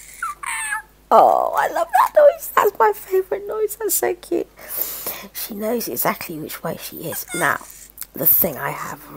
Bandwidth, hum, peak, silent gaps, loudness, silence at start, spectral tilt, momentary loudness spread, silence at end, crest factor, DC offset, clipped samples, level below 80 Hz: 16.5 kHz; none; 0 dBFS; none; -19 LUFS; 0 s; -3.5 dB/octave; 15 LU; 0 s; 20 dB; under 0.1%; under 0.1%; -54 dBFS